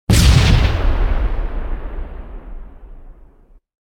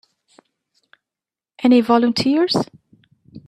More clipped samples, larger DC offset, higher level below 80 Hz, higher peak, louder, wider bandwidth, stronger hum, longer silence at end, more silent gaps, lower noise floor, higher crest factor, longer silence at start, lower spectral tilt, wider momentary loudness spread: neither; neither; first, -18 dBFS vs -62 dBFS; about the same, 0 dBFS vs -2 dBFS; about the same, -17 LUFS vs -17 LUFS; first, 18 kHz vs 11 kHz; neither; first, 0.75 s vs 0.1 s; neither; second, -47 dBFS vs -89 dBFS; about the same, 16 dB vs 20 dB; second, 0.1 s vs 1.6 s; about the same, -5 dB/octave vs -5.5 dB/octave; first, 24 LU vs 8 LU